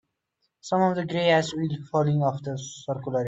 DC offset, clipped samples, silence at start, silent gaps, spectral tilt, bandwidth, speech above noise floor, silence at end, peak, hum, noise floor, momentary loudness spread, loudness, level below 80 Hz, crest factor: under 0.1%; under 0.1%; 0.65 s; none; -6 dB/octave; 8 kHz; 52 dB; 0 s; -10 dBFS; none; -77 dBFS; 12 LU; -25 LUFS; -66 dBFS; 16 dB